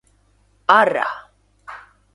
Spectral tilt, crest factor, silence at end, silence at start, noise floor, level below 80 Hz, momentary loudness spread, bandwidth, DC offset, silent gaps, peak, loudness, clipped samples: -4 dB/octave; 22 dB; 0.35 s; 0.7 s; -59 dBFS; -62 dBFS; 24 LU; 11.5 kHz; under 0.1%; none; 0 dBFS; -17 LUFS; under 0.1%